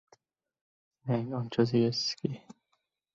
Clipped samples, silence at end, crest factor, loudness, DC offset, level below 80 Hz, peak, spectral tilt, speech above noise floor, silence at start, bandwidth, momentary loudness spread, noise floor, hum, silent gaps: under 0.1%; 0.65 s; 20 dB; -30 LUFS; under 0.1%; -70 dBFS; -12 dBFS; -6 dB/octave; 49 dB; 1.05 s; 7.6 kHz; 13 LU; -79 dBFS; none; none